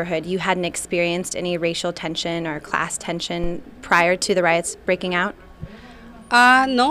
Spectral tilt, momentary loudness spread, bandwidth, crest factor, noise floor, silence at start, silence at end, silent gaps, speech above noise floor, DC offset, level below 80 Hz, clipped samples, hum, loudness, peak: -3.5 dB/octave; 12 LU; 15.5 kHz; 18 dB; -41 dBFS; 0 s; 0 s; none; 21 dB; under 0.1%; -44 dBFS; under 0.1%; none; -20 LUFS; -2 dBFS